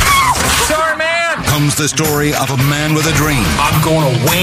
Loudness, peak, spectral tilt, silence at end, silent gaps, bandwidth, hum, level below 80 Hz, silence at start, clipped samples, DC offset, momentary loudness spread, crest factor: -12 LUFS; 0 dBFS; -3.5 dB/octave; 0 s; none; 16 kHz; none; -28 dBFS; 0 s; under 0.1%; under 0.1%; 3 LU; 12 dB